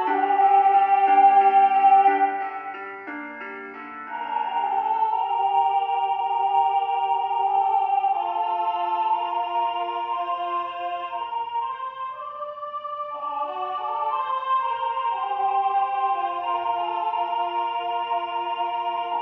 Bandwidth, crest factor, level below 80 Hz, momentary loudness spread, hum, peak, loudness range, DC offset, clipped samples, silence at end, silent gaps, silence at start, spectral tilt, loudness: 4.1 kHz; 16 dB; -76 dBFS; 15 LU; none; -8 dBFS; 9 LU; under 0.1%; under 0.1%; 0 s; none; 0 s; 1 dB/octave; -23 LUFS